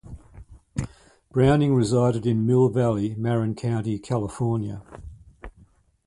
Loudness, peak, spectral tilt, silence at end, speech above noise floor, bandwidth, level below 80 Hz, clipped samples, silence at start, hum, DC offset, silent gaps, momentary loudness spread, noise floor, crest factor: -23 LUFS; -6 dBFS; -8 dB/octave; 0.55 s; 35 dB; 11.5 kHz; -46 dBFS; under 0.1%; 0.05 s; none; under 0.1%; none; 17 LU; -56 dBFS; 18 dB